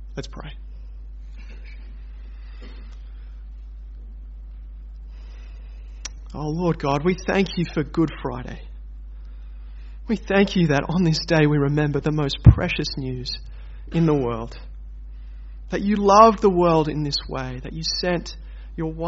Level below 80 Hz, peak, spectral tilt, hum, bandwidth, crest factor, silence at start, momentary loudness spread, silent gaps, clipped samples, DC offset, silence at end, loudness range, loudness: -34 dBFS; 0 dBFS; -5.5 dB/octave; none; 8 kHz; 22 dB; 0 s; 23 LU; none; under 0.1%; under 0.1%; 0 s; 21 LU; -21 LUFS